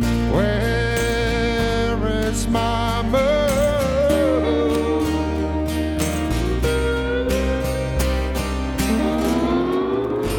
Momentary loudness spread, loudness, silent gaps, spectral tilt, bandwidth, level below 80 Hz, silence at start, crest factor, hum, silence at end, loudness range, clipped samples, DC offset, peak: 5 LU; -20 LUFS; none; -5.5 dB/octave; 18.5 kHz; -26 dBFS; 0 s; 14 dB; none; 0 s; 2 LU; under 0.1%; under 0.1%; -6 dBFS